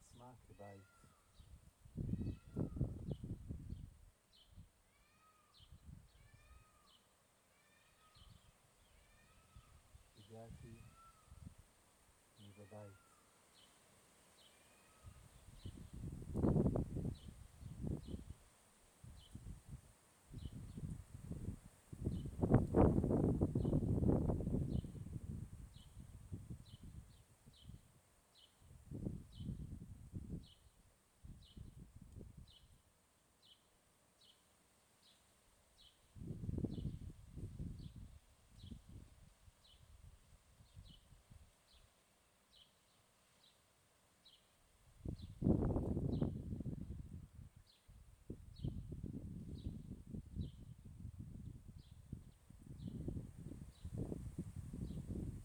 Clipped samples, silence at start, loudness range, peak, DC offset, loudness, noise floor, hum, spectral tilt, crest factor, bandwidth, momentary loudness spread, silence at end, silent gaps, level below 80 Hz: under 0.1%; 0 s; 25 LU; -16 dBFS; under 0.1%; -44 LUFS; -75 dBFS; none; -8.5 dB/octave; 30 dB; over 20 kHz; 28 LU; 0 s; none; -56 dBFS